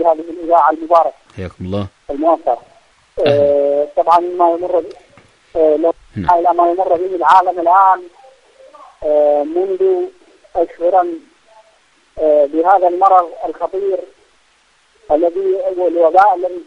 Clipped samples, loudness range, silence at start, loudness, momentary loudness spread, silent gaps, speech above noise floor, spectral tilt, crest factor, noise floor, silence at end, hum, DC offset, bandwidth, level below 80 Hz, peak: under 0.1%; 4 LU; 0 s; -14 LUFS; 12 LU; none; 41 dB; -7.5 dB/octave; 14 dB; -54 dBFS; 0.05 s; none; under 0.1%; 9.4 kHz; -50 dBFS; 0 dBFS